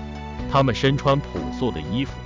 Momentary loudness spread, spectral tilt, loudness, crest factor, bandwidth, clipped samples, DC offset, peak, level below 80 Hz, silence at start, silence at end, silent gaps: 11 LU; -6.5 dB/octave; -22 LUFS; 14 dB; 7.6 kHz; under 0.1%; under 0.1%; -8 dBFS; -36 dBFS; 0 s; 0 s; none